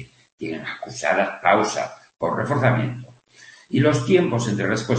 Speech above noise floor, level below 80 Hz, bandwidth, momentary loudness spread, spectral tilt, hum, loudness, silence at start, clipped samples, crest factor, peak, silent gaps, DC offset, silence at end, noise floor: 28 dB; -58 dBFS; 8.8 kHz; 13 LU; -6 dB/octave; none; -22 LUFS; 0 s; under 0.1%; 20 dB; -2 dBFS; 0.32-0.38 s; under 0.1%; 0 s; -49 dBFS